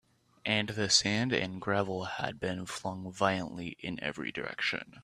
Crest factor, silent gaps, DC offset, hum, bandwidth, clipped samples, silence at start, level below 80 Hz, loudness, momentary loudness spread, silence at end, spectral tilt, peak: 24 dB; none; under 0.1%; none; 14.5 kHz; under 0.1%; 0.45 s; -64 dBFS; -32 LUFS; 13 LU; 0 s; -3 dB/octave; -10 dBFS